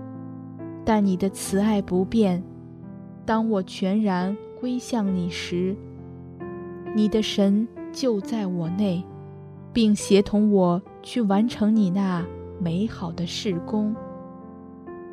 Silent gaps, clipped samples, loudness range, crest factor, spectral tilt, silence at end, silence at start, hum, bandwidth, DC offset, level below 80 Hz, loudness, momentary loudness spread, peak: none; under 0.1%; 5 LU; 20 dB; -6.5 dB/octave; 0 s; 0 s; none; 13.5 kHz; under 0.1%; -54 dBFS; -24 LUFS; 20 LU; -4 dBFS